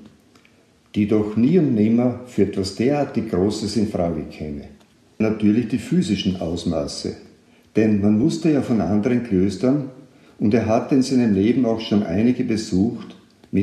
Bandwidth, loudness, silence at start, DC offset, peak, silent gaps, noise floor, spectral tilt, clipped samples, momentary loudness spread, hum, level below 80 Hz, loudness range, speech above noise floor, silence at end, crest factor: 11.5 kHz; -20 LUFS; 0 s; under 0.1%; -4 dBFS; none; -55 dBFS; -7 dB/octave; under 0.1%; 10 LU; none; -46 dBFS; 3 LU; 36 dB; 0 s; 16 dB